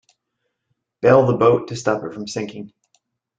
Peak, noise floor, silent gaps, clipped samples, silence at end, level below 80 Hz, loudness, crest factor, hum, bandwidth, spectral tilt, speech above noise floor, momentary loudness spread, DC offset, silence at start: -2 dBFS; -76 dBFS; none; under 0.1%; 0.7 s; -58 dBFS; -18 LUFS; 18 dB; none; 9 kHz; -6.5 dB/octave; 58 dB; 15 LU; under 0.1%; 1.05 s